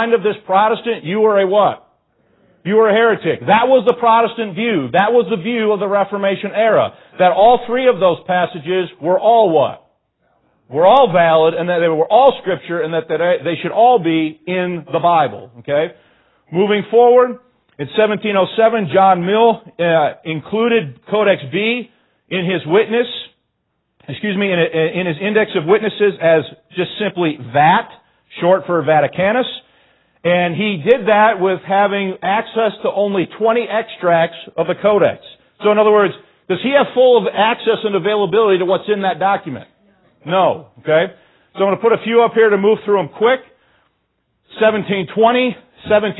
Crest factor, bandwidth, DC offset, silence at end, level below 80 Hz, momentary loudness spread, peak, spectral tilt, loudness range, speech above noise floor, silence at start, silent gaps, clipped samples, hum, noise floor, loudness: 14 dB; 4.1 kHz; under 0.1%; 0 s; -60 dBFS; 9 LU; 0 dBFS; -9.5 dB/octave; 3 LU; 55 dB; 0 s; none; under 0.1%; none; -69 dBFS; -15 LUFS